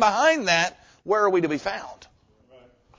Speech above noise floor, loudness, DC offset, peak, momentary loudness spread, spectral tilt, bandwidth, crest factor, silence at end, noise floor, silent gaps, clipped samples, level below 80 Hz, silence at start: 35 dB; -22 LUFS; under 0.1%; -6 dBFS; 18 LU; -3.5 dB/octave; 7.6 kHz; 18 dB; 1.05 s; -57 dBFS; none; under 0.1%; -60 dBFS; 0 s